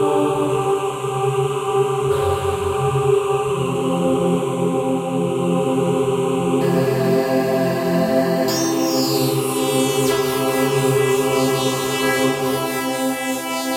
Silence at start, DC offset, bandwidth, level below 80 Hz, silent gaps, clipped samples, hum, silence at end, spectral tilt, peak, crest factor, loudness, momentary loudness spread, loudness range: 0 s; under 0.1%; 16 kHz; -50 dBFS; none; under 0.1%; none; 0 s; -5 dB/octave; -6 dBFS; 12 dB; -19 LUFS; 3 LU; 1 LU